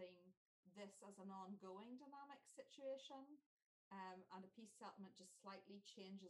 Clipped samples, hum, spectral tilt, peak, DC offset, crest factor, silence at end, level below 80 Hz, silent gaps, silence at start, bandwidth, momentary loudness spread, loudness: under 0.1%; none; -4.5 dB/octave; -44 dBFS; under 0.1%; 16 dB; 0 s; under -90 dBFS; 0.37-0.63 s, 3.46-3.57 s, 3.66-3.91 s; 0 s; 12 kHz; 7 LU; -60 LUFS